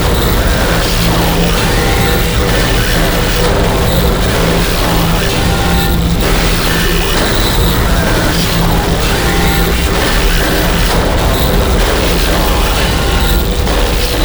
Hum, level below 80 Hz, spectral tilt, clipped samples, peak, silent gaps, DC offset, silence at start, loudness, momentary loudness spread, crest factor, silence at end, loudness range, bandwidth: none; -14 dBFS; -4.5 dB/octave; under 0.1%; 0 dBFS; none; under 0.1%; 0 s; -11 LUFS; 1 LU; 10 dB; 0 s; 0 LU; over 20 kHz